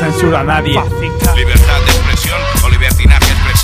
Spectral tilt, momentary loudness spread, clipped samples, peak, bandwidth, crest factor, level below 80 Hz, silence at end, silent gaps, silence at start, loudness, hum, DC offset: -4.5 dB/octave; 5 LU; 0.6%; 0 dBFS; 16.5 kHz; 10 dB; -12 dBFS; 0 s; none; 0 s; -11 LUFS; none; under 0.1%